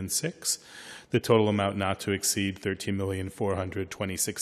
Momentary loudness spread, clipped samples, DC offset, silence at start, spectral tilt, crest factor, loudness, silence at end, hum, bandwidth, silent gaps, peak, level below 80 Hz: 9 LU; under 0.1%; under 0.1%; 0 s; -4 dB/octave; 22 dB; -28 LUFS; 0 s; none; 14 kHz; none; -8 dBFS; -64 dBFS